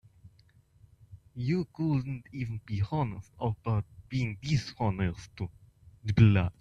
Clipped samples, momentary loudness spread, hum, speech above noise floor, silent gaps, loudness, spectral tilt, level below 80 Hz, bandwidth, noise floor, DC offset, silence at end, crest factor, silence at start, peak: under 0.1%; 16 LU; none; 33 dB; none; -31 LUFS; -7.5 dB/octave; -52 dBFS; 7.8 kHz; -62 dBFS; under 0.1%; 0.1 s; 22 dB; 1.1 s; -8 dBFS